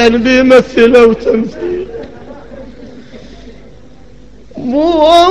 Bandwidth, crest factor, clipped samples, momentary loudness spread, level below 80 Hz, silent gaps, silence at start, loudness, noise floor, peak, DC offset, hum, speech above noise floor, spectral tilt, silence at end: 11 kHz; 10 dB; 1%; 25 LU; -36 dBFS; none; 0 s; -9 LUFS; -38 dBFS; 0 dBFS; 2%; none; 30 dB; -5 dB/octave; 0 s